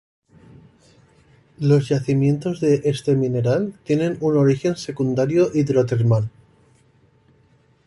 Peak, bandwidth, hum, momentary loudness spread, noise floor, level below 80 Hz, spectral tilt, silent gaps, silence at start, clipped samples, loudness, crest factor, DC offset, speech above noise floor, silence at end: -6 dBFS; 11.5 kHz; none; 5 LU; -57 dBFS; -56 dBFS; -8 dB/octave; none; 1.6 s; under 0.1%; -20 LUFS; 16 dB; under 0.1%; 39 dB; 1.55 s